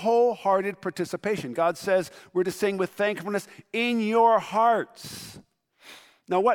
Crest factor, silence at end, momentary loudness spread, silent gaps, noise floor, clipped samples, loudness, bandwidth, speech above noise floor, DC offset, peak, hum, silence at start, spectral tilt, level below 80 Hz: 16 dB; 0 s; 12 LU; none; -52 dBFS; under 0.1%; -25 LUFS; 18.5 kHz; 27 dB; under 0.1%; -8 dBFS; none; 0 s; -5 dB/octave; -70 dBFS